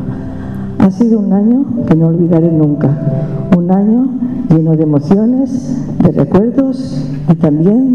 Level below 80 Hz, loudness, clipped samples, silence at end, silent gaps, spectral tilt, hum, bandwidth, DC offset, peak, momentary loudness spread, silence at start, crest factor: -36 dBFS; -11 LUFS; under 0.1%; 0 s; none; -10.5 dB/octave; none; 6.8 kHz; 1%; 0 dBFS; 8 LU; 0 s; 10 dB